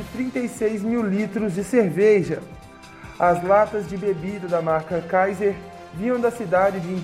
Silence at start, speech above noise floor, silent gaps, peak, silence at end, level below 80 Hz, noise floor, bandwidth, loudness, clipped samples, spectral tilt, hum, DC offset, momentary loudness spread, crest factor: 0 s; 20 dB; none; -6 dBFS; 0 s; -52 dBFS; -41 dBFS; 15 kHz; -22 LUFS; under 0.1%; -7 dB/octave; none; under 0.1%; 11 LU; 16 dB